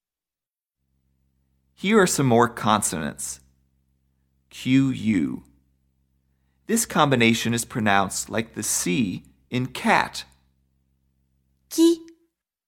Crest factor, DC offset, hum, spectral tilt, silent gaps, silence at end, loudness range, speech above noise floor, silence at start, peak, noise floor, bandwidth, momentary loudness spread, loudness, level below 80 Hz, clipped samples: 22 dB; under 0.1%; none; -4 dB/octave; none; 0.6 s; 4 LU; over 68 dB; 1.8 s; -4 dBFS; under -90 dBFS; 17.5 kHz; 12 LU; -22 LUFS; -56 dBFS; under 0.1%